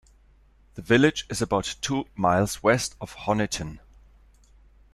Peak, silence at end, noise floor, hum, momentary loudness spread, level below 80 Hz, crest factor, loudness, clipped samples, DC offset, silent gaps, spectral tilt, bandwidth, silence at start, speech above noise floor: -4 dBFS; 1.15 s; -57 dBFS; none; 13 LU; -50 dBFS; 22 dB; -25 LUFS; under 0.1%; under 0.1%; none; -4.5 dB/octave; 14.5 kHz; 0.75 s; 33 dB